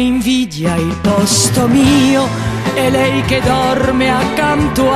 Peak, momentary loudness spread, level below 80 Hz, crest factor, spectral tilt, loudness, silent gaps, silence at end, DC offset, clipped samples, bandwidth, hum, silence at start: 0 dBFS; 6 LU; -30 dBFS; 12 dB; -4.5 dB/octave; -13 LUFS; none; 0 s; under 0.1%; under 0.1%; 14 kHz; none; 0 s